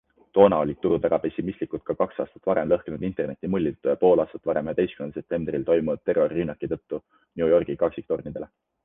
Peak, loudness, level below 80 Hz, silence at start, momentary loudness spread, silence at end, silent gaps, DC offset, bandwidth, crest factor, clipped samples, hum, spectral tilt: -2 dBFS; -25 LUFS; -54 dBFS; 0.35 s; 12 LU; 0.4 s; none; under 0.1%; 3.8 kHz; 22 dB; under 0.1%; none; -10.5 dB/octave